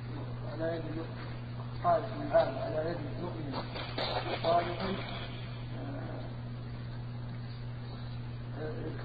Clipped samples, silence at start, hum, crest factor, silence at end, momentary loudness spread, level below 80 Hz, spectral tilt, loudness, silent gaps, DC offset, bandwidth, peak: under 0.1%; 0 s; none; 20 dB; 0 s; 12 LU; -50 dBFS; -9.5 dB/octave; -36 LUFS; none; under 0.1%; 5 kHz; -14 dBFS